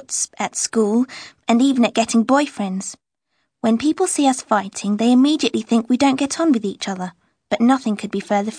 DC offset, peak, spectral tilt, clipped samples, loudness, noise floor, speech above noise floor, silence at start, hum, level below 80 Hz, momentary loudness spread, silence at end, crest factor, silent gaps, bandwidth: under 0.1%; -2 dBFS; -4 dB/octave; under 0.1%; -19 LUFS; -72 dBFS; 54 dB; 0.1 s; none; -64 dBFS; 10 LU; 0 s; 16 dB; none; 10.5 kHz